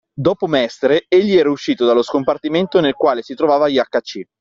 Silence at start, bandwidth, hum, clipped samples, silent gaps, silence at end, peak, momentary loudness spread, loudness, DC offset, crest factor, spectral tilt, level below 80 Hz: 0.15 s; 7.6 kHz; none; under 0.1%; none; 0.15 s; -2 dBFS; 5 LU; -16 LUFS; under 0.1%; 14 dB; -4 dB/octave; -56 dBFS